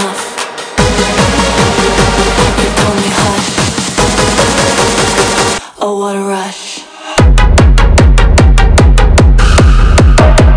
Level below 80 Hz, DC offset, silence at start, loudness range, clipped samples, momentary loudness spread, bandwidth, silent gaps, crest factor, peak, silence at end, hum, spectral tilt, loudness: -10 dBFS; under 0.1%; 0 s; 4 LU; under 0.1%; 9 LU; 10.5 kHz; none; 8 dB; 0 dBFS; 0 s; none; -4.5 dB/octave; -9 LUFS